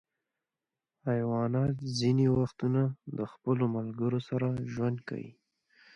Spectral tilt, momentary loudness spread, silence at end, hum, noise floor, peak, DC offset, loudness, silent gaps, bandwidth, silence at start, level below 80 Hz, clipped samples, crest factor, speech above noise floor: -7.5 dB/octave; 11 LU; 0.65 s; none; under -90 dBFS; -16 dBFS; under 0.1%; -31 LUFS; none; 9.8 kHz; 1.05 s; -62 dBFS; under 0.1%; 16 dB; over 60 dB